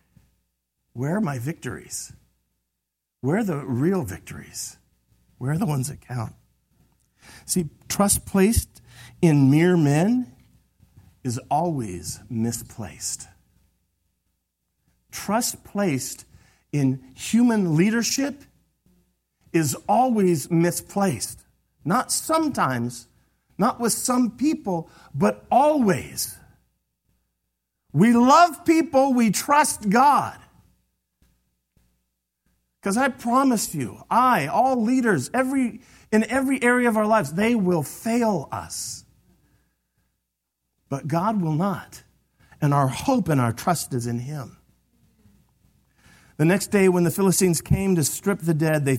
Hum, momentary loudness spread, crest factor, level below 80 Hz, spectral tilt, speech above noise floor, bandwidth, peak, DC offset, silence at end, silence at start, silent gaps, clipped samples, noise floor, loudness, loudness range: none; 14 LU; 20 dB; -50 dBFS; -5.5 dB/octave; 60 dB; 16.5 kHz; -4 dBFS; under 0.1%; 0 s; 0.95 s; none; under 0.1%; -81 dBFS; -22 LUFS; 9 LU